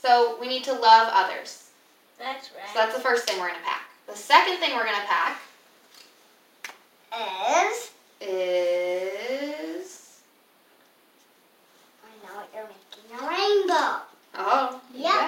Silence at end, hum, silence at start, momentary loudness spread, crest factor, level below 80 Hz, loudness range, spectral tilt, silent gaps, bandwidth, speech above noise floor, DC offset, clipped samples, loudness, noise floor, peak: 0 s; none; 0.05 s; 23 LU; 24 dB; under -90 dBFS; 14 LU; -1 dB/octave; none; 16.5 kHz; 36 dB; under 0.1%; under 0.1%; -24 LUFS; -60 dBFS; -2 dBFS